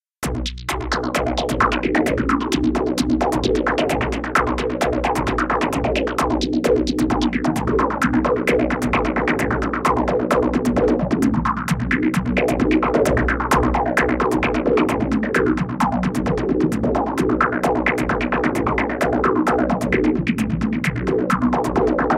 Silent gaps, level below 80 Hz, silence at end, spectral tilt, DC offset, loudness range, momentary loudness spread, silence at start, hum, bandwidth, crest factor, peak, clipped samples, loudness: none; -32 dBFS; 0 s; -6 dB/octave; under 0.1%; 1 LU; 3 LU; 0.2 s; none; 16 kHz; 16 dB; -4 dBFS; under 0.1%; -19 LUFS